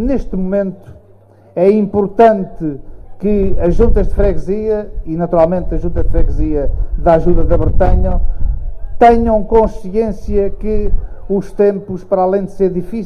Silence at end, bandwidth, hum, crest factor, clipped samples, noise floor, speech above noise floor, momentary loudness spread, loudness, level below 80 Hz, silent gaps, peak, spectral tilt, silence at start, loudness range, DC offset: 0 s; 4.8 kHz; none; 12 dB; under 0.1%; -43 dBFS; 32 dB; 12 LU; -15 LUFS; -18 dBFS; none; 0 dBFS; -9.5 dB/octave; 0 s; 2 LU; under 0.1%